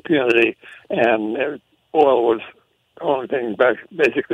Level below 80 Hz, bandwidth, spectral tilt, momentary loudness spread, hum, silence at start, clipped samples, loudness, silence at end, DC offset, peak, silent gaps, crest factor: -64 dBFS; 9 kHz; -6 dB/octave; 11 LU; none; 0.05 s; under 0.1%; -19 LUFS; 0 s; under 0.1%; -2 dBFS; none; 16 dB